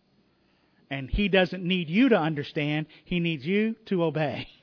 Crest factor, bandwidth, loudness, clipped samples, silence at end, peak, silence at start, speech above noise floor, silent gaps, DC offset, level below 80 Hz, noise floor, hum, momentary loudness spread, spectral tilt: 18 dB; 5.4 kHz; -26 LUFS; under 0.1%; 0.15 s; -8 dBFS; 0.9 s; 40 dB; none; under 0.1%; -44 dBFS; -66 dBFS; none; 10 LU; -8 dB/octave